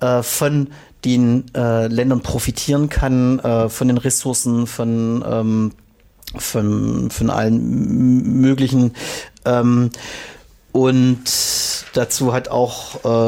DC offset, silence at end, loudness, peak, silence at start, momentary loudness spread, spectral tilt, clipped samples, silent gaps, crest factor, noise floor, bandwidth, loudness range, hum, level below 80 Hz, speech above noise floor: under 0.1%; 0 s; -17 LUFS; -4 dBFS; 0 s; 9 LU; -5.5 dB/octave; under 0.1%; none; 14 dB; -40 dBFS; 17 kHz; 3 LU; none; -36 dBFS; 23 dB